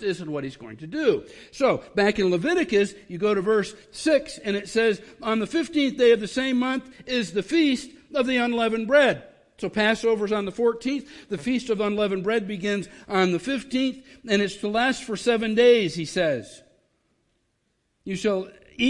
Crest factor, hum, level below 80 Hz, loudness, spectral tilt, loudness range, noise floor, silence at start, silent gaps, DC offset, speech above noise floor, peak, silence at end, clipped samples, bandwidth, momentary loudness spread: 16 dB; none; -58 dBFS; -24 LUFS; -5 dB/octave; 2 LU; -72 dBFS; 0 s; none; under 0.1%; 49 dB; -8 dBFS; 0 s; under 0.1%; 11.5 kHz; 12 LU